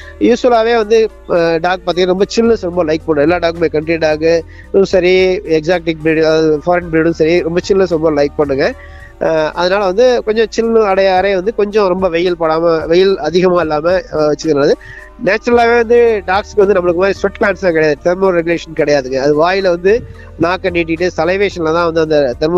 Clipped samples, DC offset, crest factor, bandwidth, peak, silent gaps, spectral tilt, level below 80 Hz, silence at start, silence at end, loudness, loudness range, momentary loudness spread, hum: under 0.1%; under 0.1%; 12 dB; 7.8 kHz; 0 dBFS; none; -6 dB/octave; -36 dBFS; 0 s; 0 s; -12 LUFS; 1 LU; 5 LU; none